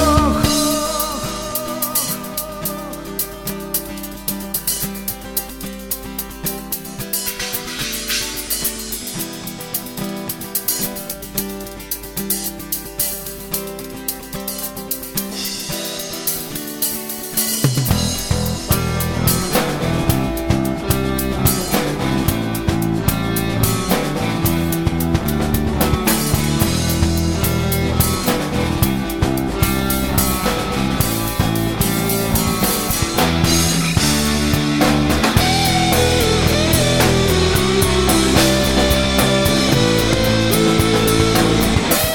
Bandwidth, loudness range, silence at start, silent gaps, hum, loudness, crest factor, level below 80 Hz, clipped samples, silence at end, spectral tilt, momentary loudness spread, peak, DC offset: 17.5 kHz; 9 LU; 0 s; none; none; -18 LUFS; 18 dB; -30 dBFS; under 0.1%; 0 s; -4 dB/octave; 10 LU; 0 dBFS; under 0.1%